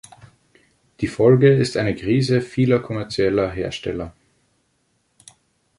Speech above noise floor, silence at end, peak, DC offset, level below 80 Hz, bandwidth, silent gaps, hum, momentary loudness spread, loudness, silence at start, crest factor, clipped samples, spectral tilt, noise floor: 48 dB; 1.7 s; -2 dBFS; under 0.1%; -48 dBFS; 11.5 kHz; none; none; 14 LU; -19 LUFS; 1 s; 18 dB; under 0.1%; -7 dB/octave; -67 dBFS